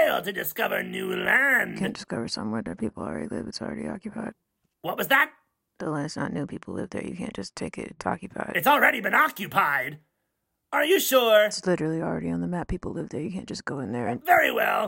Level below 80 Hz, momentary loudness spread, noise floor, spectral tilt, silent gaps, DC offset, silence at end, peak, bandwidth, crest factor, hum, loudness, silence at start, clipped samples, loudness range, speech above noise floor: -54 dBFS; 15 LU; -79 dBFS; -4 dB/octave; none; under 0.1%; 0 s; -6 dBFS; 16.5 kHz; 20 dB; none; -25 LUFS; 0 s; under 0.1%; 7 LU; 53 dB